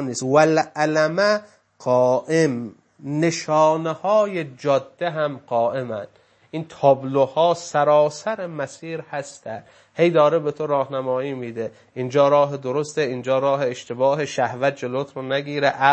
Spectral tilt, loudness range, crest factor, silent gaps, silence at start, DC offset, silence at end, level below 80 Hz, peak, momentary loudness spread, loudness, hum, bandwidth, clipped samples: -5.5 dB/octave; 2 LU; 20 dB; none; 0 s; under 0.1%; 0 s; -72 dBFS; -2 dBFS; 14 LU; -21 LUFS; none; 8.8 kHz; under 0.1%